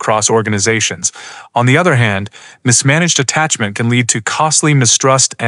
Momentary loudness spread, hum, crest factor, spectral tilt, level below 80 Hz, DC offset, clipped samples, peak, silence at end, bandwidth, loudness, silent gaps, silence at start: 9 LU; none; 12 dB; -3.5 dB/octave; -56 dBFS; under 0.1%; under 0.1%; 0 dBFS; 0 s; 12 kHz; -12 LUFS; none; 0 s